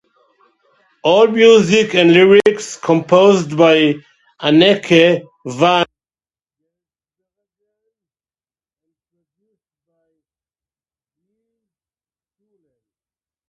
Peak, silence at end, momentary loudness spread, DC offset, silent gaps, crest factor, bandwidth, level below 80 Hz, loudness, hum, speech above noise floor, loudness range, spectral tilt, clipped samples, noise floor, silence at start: 0 dBFS; 7.65 s; 12 LU; under 0.1%; none; 16 dB; 11 kHz; -62 dBFS; -12 LUFS; none; over 79 dB; 11 LU; -5 dB/octave; under 0.1%; under -90 dBFS; 1.05 s